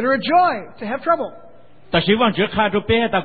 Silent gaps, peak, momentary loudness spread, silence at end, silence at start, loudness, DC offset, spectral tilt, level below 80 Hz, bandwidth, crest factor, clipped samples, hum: none; -2 dBFS; 10 LU; 0 s; 0 s; -18 LUFS; 0.9%; -10.5 dB/octave; -44 dBFS; 4.8 kHz; 16 dB; under 0.1%; none